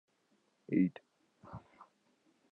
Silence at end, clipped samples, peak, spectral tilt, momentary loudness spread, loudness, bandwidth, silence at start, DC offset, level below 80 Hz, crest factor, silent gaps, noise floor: 0.95 s; under 0.1%; -18 dBFS; -10 dB/octave; 21 LU; -35 LUFS; 4.5 kHz; 0.7 s; under 0.1%; -78 dBFS; 22 dB; none; -76 dBFS